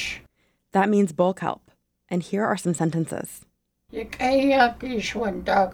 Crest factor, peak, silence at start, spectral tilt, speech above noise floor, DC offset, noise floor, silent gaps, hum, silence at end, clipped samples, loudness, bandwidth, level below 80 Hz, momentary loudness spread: 18 dB; -6 dBFS; 0 s; -5.5 dB/octave; 40 dB; under 0.1%; -62 dBFS; none; none; 0 s; under 0.1%; -24 LUFS; 17.5 kHz; -52 dBFS; 17 LU